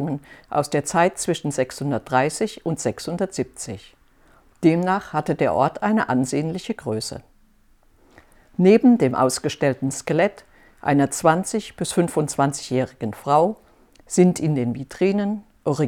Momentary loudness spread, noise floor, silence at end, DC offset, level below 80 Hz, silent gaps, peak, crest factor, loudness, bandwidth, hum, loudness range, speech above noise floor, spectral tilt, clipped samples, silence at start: 10 LU; -56 dBFS; 0 s; under 0.1%; -56 dBFS; none; -2 dBFS; 20 dB; -21 LUFS; 17 kHz; none; 4 LU; 35 dB; -5.5 dB/octave; under 0.1%; 0 s